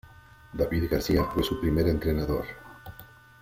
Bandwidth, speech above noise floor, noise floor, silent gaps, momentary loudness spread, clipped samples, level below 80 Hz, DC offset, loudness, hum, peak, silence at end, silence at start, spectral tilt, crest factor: 16.5 kHz; 25 dB; -51 dBFS; none; 20 LU; under 0.1%; -40 dBFS; under 0.1%; -27 LUFS; none; -10 dBFS; 0.35 s; 0.05 s; -6.5 dB/octave; 18 dB